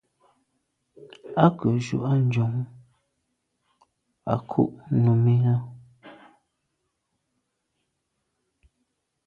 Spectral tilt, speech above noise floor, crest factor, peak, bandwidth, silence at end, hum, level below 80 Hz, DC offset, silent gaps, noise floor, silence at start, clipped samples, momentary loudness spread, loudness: -9 dB/octave; 55 dB; 24 dB; -2 dBFS; 7.8 kHz; 3.15 s; none; -60 dBFS; under 0.1%; none; -77 dBFS; 1 s; under 0.1%; 15 LU; -24 LUFS